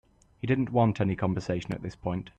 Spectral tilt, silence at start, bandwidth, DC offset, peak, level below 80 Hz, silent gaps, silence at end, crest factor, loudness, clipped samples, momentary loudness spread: -8 dB/octave; 0.45 s; 8.6 kHz; under 0.1%; -12 dBFS; -54 dBFS; none; 0.1 s; 16 dB; -29 LUFS; under 0.1%; 10 LU